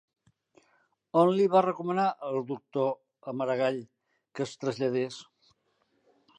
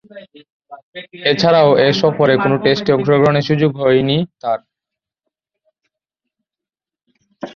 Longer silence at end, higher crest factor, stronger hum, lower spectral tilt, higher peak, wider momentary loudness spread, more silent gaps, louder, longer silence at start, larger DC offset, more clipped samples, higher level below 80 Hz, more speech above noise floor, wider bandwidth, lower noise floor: first, 1.15 s vs 0.05 s; about the same, 20 dB vs 16 dB; neither; about the same, -6.5 dB/octave vs -6.5 dB/octave; second, -10 dBFS vs -2 dBFS; about the same, 15 LU vs 13 LU; second, none vs 0.52-0.60 s, 0.83-0.93 s; second, -29 LUFS vs -14 LUFS; first, 1.15 s vs 0.15 s; neither; neither; second, -82 dBFS vs -54 dBFS; second, 46 dB vs 74 dB; first, 9.6 kHz vs 7 kHz; second, -73 dBFS vs -88 dBFS